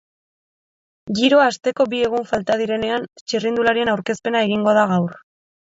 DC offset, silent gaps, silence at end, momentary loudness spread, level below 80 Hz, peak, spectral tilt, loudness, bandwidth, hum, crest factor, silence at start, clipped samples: under 0.1%; 3.21-3.26 s; 0.6 s; 9 LU; -58 dBFS; -4 dBFS; -5 dB/octave; -19 LUFS; 7.8 kHz; none; 16 dB; 1.05 s; under 0.1%